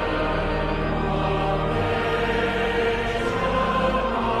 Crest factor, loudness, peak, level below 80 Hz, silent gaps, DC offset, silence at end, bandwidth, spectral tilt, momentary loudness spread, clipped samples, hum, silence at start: 12 dB; -23 LUFS; -10 dBFS; -32 dBFS; none; under 0.1%; 0 s; 12.5 kHz; -6.5 dB/octave; 2 LU; under 0.1%; none; 0 s